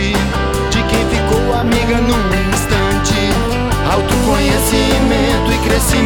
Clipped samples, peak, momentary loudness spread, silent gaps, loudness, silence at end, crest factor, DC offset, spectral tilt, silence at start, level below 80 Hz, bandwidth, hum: under 0.1%; 0 dBFS; 3 LU; none; -14 LUFS; 0 s; 12 dB; under 0.1%; -4.5 dB/octave; 0 s; -20 dBFS; over 20 kHz; none